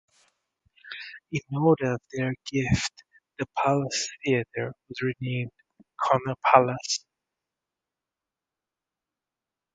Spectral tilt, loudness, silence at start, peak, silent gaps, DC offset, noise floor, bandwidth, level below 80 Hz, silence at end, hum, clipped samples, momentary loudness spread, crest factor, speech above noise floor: -5 dB/octave; -26 LUFS; 0.85 s; 0 dBFS; none; under 0.1%; -89 dBFS; 9.4 kHz; -54 dBFS; 2.8 s; none; under 0.1%; 15 LU; 28 dB; 63 dB